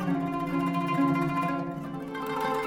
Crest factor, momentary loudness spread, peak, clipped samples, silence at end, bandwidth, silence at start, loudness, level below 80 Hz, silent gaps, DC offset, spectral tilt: 14 dB; 9 LU; -14 dBFS; under 0.1%; 0 s; 16.5 kHz; 0 s; -29 LUFS; -58 dBFS; none; under 0.1%; -7 dB/octave